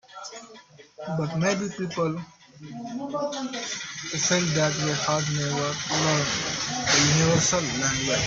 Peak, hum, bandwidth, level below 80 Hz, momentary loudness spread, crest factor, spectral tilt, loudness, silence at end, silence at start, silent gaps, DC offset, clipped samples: -8 dBFS; none; 8 kHz; -54 dBFS; 18 LU; 18 dB; -3.5 dB/octave; -24 LUFS; 0 s; 0.1 s; none; under 0.1%; under 0.1%